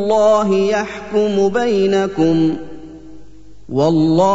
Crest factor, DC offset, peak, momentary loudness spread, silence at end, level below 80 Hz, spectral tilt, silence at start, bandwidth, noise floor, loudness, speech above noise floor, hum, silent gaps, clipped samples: 12 dB; 2%; -2 dBFS; 10 LU; 0 s; -46 dBFS; -6.5 dB/octave; 0 s; 8 kHz; -42 dBFS; -15 LUFS; 28 dB; 50 Hz at -45 dBFS; none; under 0.1%